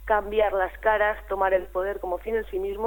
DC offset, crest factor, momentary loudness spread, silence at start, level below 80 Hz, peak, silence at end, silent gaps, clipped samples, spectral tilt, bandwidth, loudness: under 0.1%; 16 dB; 7 LU; 0 s; -44 dBFS; -8 dBFS; 0 s; none; under 0.1%; -6 dB/octave; 17.5 kHz; -25 LUFS